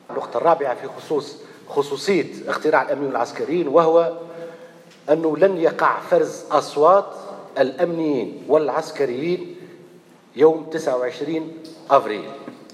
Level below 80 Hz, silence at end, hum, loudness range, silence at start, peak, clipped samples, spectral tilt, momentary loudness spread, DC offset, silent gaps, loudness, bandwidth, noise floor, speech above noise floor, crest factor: -76 dBFS; 0.1 s; none; 4 LU; 0.1 s; -2 dBFS; under 0.1%; -5.5 dB/octave; 19 LU; under 0.1%; none; -20 LUFS; 12.5 kHz; -48 dBFS; 28 dB; 18 dB